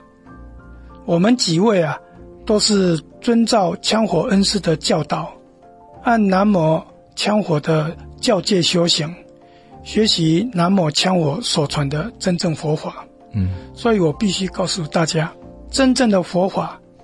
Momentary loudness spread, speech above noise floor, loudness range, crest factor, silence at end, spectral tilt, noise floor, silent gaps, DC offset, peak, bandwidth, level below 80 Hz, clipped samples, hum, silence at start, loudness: 10 LU; 28 dB; 3 LU; 16 dB; 0.25 s; -5 dB/octave; -45 dBFS; none; under 0.1%; -2 dBFS; 11.5 kHz; -44 dBFS; under 0.1%; none; 0.3 s; -18 LUFS